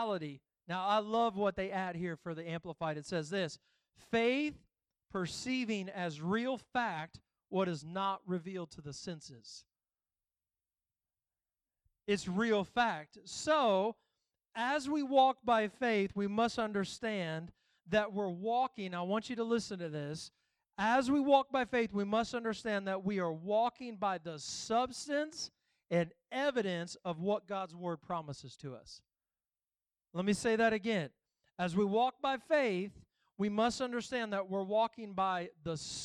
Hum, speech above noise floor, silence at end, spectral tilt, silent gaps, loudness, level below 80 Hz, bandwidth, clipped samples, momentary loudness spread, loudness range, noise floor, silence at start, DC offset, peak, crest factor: none; over 55 dB; 0 s; -5 dB/octave; none; -35 LUFS; -70 dBFS; 12 kHz; under 0.1%; 14 LU; 8 LU; under -90 dBFS; 0 s; under 0.1%; -16 dBFS; 20 dB